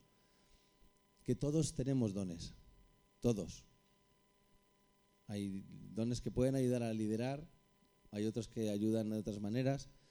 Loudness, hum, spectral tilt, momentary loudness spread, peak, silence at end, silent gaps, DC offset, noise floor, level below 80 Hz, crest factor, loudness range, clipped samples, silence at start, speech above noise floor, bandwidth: -39 LUFS; none; -6.5 dB/octave; 13 LU; -22 dBFS; 0.2 s; none; under 0.1%; -73 dBFS; -60 dBFS; 18 dB; 7 LU; under 0.1%; 1.25 s; 35 dB; over 20 kHz